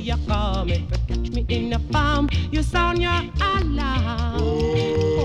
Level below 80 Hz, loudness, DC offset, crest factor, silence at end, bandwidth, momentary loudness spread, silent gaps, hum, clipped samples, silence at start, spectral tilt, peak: -26 dBFS; -22 LUFS; under 0.1%; 14 dB; 0 s; 10.5 kHz; 4 LU; none; none; under 0.1%; 0 s; -6.5 dB/octave; -8 dBFS